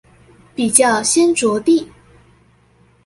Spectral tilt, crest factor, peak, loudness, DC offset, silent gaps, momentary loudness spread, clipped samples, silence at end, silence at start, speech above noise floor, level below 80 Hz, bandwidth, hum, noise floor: -2.5 dB/octave; 18 dB; 0 dBFS; -14 LUFS; under 0.1%; none; 14 LU; under 0.1%; 1.2 s; 0.6 s; 39 dB; -54 dBFS; 16 kHz; none; -53 dBFS